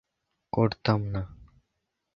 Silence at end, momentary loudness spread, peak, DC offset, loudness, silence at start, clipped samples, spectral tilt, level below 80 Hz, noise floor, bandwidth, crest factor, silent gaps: 0.75 s; 10 LU; -8 dBFS; under 0.1%; -28 LUFS; 0.55 s; under 0.1%; -8.5 dB/octave; -50 dBFS; -81 dBFS; 6.2 kHz; 24 dB; none